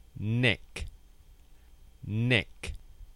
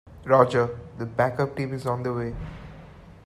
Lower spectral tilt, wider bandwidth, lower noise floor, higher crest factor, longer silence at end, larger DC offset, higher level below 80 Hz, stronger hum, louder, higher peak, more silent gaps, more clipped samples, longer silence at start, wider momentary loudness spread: second, -6 dB/octave vs -7.5 dB/octave; second, 12 kHz vs 13.5 kHz; first, -55 dBFS vs -46 dBFS; about the same, 24 dB vs 22 dB; about the same, 0.05 s vs 0.15 s; neither; about the same, -48 dBFS vs -48 dBFS; neither; second, -29 LUFS vs -25 LUFS; second, -10 dBFS vs -4 dBFS; neither; neither; about the same, 0.15 s vs 0.05 s; about the same, 20 LU vs 19 LU